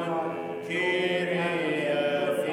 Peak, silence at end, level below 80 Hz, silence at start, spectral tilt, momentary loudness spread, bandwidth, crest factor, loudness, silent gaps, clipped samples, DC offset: -16 dBFS; 0 s; -78 dBFS; 0 s; -5.5 dB/octave; 6 LU; 16.5 kHz; 12 dB; -27 LUFS; none; under 0.1%; under 0.1%